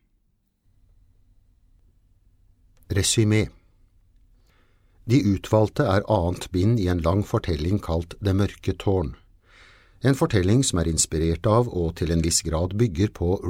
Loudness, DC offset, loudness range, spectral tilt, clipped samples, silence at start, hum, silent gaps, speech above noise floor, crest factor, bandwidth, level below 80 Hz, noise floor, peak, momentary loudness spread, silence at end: -23 LUFS; under 0.1%; 5 LU; -5.5 dB/octave; under 0.1%; 2.9 s; none; none; 47 dB; 18 dB; 16 kHz; -40 dBFS; -68 dBFS; -6 dBFS; 6 LU; 0 s